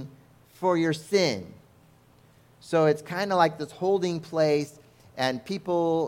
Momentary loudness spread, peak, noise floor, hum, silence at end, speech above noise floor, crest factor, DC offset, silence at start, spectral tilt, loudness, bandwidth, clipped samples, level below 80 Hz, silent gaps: 11 LU; -6 dBFS; -57 dBFS; none; 0 s; 32 dB; 22 dB; under 0.1%; 0 s; -5.5 dB/octave; -26 LUFS; 16.5 kHz; under 0.1%; -68 dBFS; none